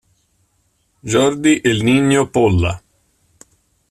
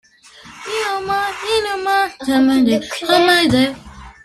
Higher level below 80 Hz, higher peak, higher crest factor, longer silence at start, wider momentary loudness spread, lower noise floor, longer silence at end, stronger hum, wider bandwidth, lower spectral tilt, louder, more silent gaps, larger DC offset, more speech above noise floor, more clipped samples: about the same, -44 dBFS vs -48 dBFS; about the same, -2 dBFS vs -2 dBFS; about the same, 16 dB vs 14 dB; first, 1.05 s vs 0.45 s; about the same, 8 LU vs 9 LU; first, -63 dBFS vs -43 dBFS; first, 1.15 s vs 0.15 s; neither; about the same, 14 kHz vs 14.5 kHz; first, -5.5 dB/octave vs -4 dB/octave; about the same, -15 LUFS vs -16 LUFS; neither; neither; first, 49 dB vs 28 dB; neither